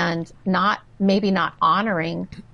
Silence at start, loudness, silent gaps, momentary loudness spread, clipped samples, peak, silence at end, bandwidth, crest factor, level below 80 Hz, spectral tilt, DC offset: 0 s; -21 LUFS; none; 8 LU; under 0.1%; -8 dBFS; 0.15 s; 6.8 kHz; 14 dB; -54 dBFS; -6.5 dB/octave; 0.1%